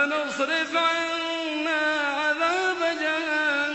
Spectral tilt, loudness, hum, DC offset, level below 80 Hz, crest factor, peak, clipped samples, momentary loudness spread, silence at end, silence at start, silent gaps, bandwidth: -1.5 dB/octave; -24 LUFS; none; under 0.1%; -68 dBFS; 16 dB; -10 dBFS; under 0.1%; 4 LU; 0 s; 0 s; none; 8.4 kHz